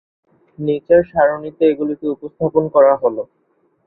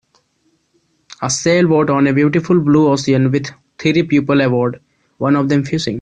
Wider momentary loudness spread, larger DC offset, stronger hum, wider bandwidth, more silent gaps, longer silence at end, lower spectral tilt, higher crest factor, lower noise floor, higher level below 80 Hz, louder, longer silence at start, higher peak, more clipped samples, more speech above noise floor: first, 12 LU vs 9 LU; neither; neither; second, 4.1 kHz vs 9.6 kHz; neither; first, 0.65 s vs 0 s; first, -11.5 dB/octave vs -6 dB/octave; about the same, 16 dB vs 14 dB; about the same, -62 dBFS vs -62 dBFS; about the same, -52 dBFS vs -52 dBFS; about the same, -16 LUFS vs -15 LUFS; second, 0.6 s vs 1.2 s; about the same, -2 dBFS vs -2 dBFS; neither; about the same, 46 dB vs 48 dB